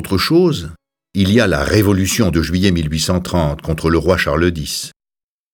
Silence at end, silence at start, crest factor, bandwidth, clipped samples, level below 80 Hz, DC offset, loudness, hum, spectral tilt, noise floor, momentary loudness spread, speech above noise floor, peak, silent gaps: 0.65 s; 0 s; 16 dB; 19 kHz; under 0.1%; -32 dBFS; under 0.1%; -15 LUFS; none; -5 dB/octave; -90 dBFS; 10 LU; 75 dB; 0 dBFS; none